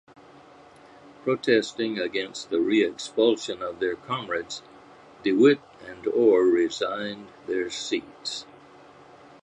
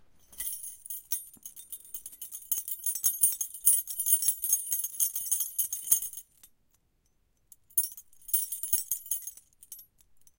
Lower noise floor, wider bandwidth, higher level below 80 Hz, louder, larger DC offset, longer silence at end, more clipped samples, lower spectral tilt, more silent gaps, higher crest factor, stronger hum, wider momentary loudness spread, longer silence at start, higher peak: second, -51 dBFS vs -71 dBFS; second, 9.8 kHz vs 17.5 kHz; about the same, -68 dBFS vs -66 dBFS; first, -25 LUFS vs -28 LUFS; neither; first, 1 s vs 0.55 s; neither; first, -4.5 dB/octave vs 2.5 dB/octave; neither; second, 20 dB vs 30 dB; neither; second, 14 LU vs 19 LU; first, 1.05 s vs 0.3 s; about the same, -6 dBFS vs -4 dBFS